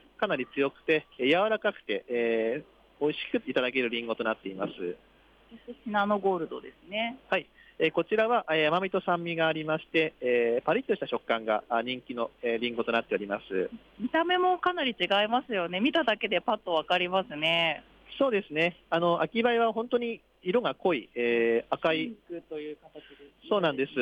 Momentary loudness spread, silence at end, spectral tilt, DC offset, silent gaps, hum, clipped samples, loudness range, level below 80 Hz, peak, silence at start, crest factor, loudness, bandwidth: 11 LU; 0 s; -6.5 dB/octave; under 0.1%; none; none; under 0.1%; 4 LU; -68 dBFS; -14 dBFS; 0.2 s; 16 dB; -28 LUFS; 8.2 kHz